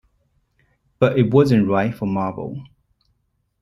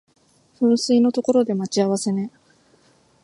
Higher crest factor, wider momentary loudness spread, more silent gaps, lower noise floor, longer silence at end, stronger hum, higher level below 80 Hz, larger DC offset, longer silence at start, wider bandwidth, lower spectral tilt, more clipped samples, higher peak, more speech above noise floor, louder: about the same, 18 dB vs 16 dB; first, 16 LU vs 8 LU; neither; first, -69 dBFS vs -57 dBFS; about the same, 1 s vs 0.95 s; neither; first, -54 dBFS vs -70 dBFS; neither; first, 1 s vs 0.6 s; about the same, 12.5 kHz vs 11.5 kHz; first, -8.5 dB/octave vs -5.5 dB/octave; neither; first, -2 dBFS vs -6 dBFS; first, 51 dB vs 38 dB; about the same, -19 LUFS vs -20 LUFS